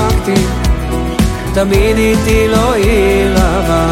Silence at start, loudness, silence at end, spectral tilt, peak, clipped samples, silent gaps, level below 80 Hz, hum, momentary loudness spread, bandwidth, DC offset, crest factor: 0 s; -12 LUFS; 0 s; -5.5 dB/octave; 0 dBFS; under 0.1%; none; -18 dBFS; none; 5 LU; 16.5 kHz; under 0.1%; 10 dB